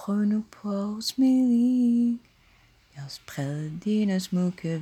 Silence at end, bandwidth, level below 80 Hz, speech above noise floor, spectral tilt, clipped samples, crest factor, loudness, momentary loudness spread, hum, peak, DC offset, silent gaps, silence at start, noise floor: 0 s; 14.5 kHz; -66 dBFS; 34 dB; -6.5 dB/octave; under 0.1%; 12 dB; -25 LUFS; 14 LU; none; -14 dBFS; under 0.1%; none; 0 s; -59 dBFS